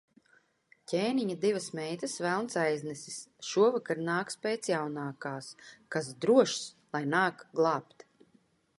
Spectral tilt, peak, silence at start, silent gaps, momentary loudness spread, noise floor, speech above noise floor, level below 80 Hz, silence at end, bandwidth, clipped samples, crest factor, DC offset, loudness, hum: -4.5 dB/octave; -10 dBFS; 0.9 s; none; 13 LU; -68 dBFS; 37 dB; -80 dBFS; 0.95 s; 11.5 kHz; under 0.1%; 22 dB; under 0.1%; -31 LUFS; none